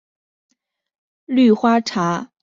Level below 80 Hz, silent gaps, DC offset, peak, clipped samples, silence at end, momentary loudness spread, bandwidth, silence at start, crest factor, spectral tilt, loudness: -64 dBFS; none; under 0.1%; -4 dBFS; under 0.1%; 0.15 s; 8 LU; 7.6 kHz; 1.3 s; 16 dB; -6 dB/octave; -17 LUFS